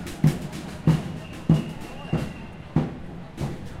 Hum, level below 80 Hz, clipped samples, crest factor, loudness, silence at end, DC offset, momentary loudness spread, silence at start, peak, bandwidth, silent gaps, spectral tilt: none; -42 dBFS; under 0.1%; 20 dB; -27 LUFS; 0 s; under 0.1%; 13 LU; 0 s; -6 dBFS; 14.5 kHz; none; -7.5 dB/octave